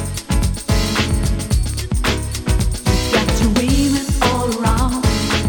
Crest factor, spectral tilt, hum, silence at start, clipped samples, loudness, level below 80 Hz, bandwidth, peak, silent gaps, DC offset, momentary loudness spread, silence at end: 14 dB; -4.5 dB/octave; none; 0 s; under 0.1%; -18 LUFS; -22 dBFS; 19 kHz; -2 dBFS; none; under 0.1%; 4 LU; 0 s